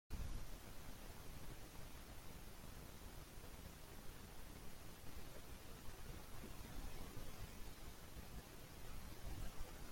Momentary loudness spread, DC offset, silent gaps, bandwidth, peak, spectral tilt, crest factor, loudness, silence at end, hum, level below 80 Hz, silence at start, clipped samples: 4 LU; under 0.1%; none; 16.5 kHz; -36 dBFS; -4 dB/octave; 16 dB; -57 LUFS; 0 s; none; -56 dBFS; 0.1 s; under 0.1%